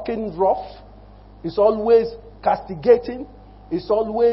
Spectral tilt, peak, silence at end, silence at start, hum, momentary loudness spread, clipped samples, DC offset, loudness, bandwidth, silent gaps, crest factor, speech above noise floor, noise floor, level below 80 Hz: -11 dB/octave; -2 dBFS; 0 s; 0 s; 50 Hz at -45 dBFS; 16 LU; under 0.1%; under 0.1%; -20 LUFS; 5.8 kHz; none; 18 dB; 25 dB; -44 dBFS; -46 dBFS